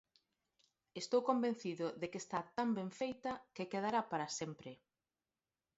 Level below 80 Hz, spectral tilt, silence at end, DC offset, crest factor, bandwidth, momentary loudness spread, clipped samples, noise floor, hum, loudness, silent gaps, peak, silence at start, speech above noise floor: -82 dBFS; -4.5 dB/octave; 1.05 s; under 0.1%; 22 dB; 7.6 kHz; 11 LU; under 0.1%; under -90 dBFS; none; -40 LUFS; none; -20 dBFS; 0.95 s; over 50 dB